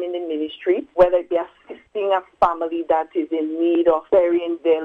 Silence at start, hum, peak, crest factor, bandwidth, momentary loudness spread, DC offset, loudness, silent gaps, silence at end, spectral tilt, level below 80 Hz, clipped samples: 0 s; none; -2 dBFS; 18 dB; 4.8 kHz; 9 LU; under 0.1%; -20 LUFS; none; 0 s; -7 dB/octave; -50 dBFS; under 0.1%